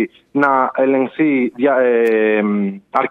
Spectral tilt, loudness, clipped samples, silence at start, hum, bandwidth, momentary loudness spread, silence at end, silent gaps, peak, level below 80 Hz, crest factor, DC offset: -8 dB/octave; -16 LUFS; under 0.1%; 0 s; none; 5.6 kHz; 6 LU; 0 s; none; 0 dBFS; -68 dBFS; 14 dB; under 0.1%